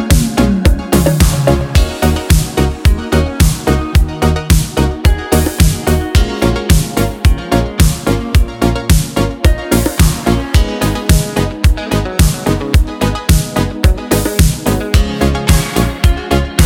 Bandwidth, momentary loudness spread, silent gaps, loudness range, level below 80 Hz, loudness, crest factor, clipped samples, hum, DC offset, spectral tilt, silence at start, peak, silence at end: 18 kHz; 4 LU; none; 1 LU; -14 dBFS; -13 LUFS; 12 dB; under 0.1%; none; under 0.1%; -5.5 dB/octave; 0 s; 0 dBFS; 0 s